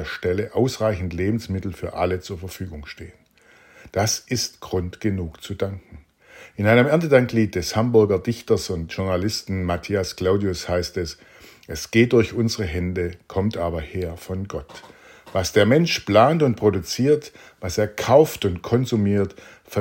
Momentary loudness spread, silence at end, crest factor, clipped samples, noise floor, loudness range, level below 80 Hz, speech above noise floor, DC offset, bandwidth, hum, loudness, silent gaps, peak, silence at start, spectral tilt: 16 LU; 0 s; 20 dB; under 0.1%; -54 dBFS; 7 LU; -48 dBFS; 32 dB; under 0.1%; 16.5 kHz; none; -22 LUFS; none; -2 dBFS; 0 s; -5.5 dB/octave